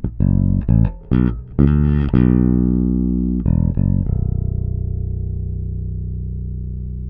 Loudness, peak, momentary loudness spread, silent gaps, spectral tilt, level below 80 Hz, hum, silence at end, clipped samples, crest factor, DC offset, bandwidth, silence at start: -19 LUFS; 0 dBFS; 12 LU; none; -13 dB/octave; -24 dBFS; 60 Hz at -40 dBFS; 0 s; under 0.1%; 16 dB; under 0.1%; 3.6 kHz; 0 s